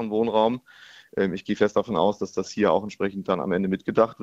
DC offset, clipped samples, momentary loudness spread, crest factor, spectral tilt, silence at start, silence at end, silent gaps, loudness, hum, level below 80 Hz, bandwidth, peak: under 0.1%; under 0.1%; 7 LU; 20 dB; -6.5 dB/octave; 0 s; 0 s; none; -25 LUFS; none; -60 dBFS; 8 kHz; -4 dBFS